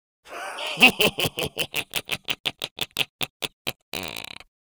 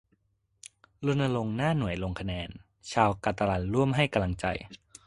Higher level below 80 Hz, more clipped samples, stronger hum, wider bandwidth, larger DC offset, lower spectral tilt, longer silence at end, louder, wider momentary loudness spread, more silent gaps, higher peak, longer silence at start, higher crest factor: second, -56 dBFS vs -48 dBFS; neither; neither; first, over 20 kHz vs 11.5 kHz; neither; second, -2 dB/octave vs -6.5 dB/octave; about the same, 0.4 s vs 0.3 s; first, -24 LUFS vs -29 LUFS; first, 18 LU vs 12 LU; first, 2.40-2.44 s, 2.71-2.76 s, 3.09-3.19 s, 3.30-3.40 s, 3.53-3.65 s, 3.82-3.92 s vs none; first, 0 dBFS vs -6 dBFS; second, 0.25 s vs 1 s; about the same, 26 dB vs 22 dB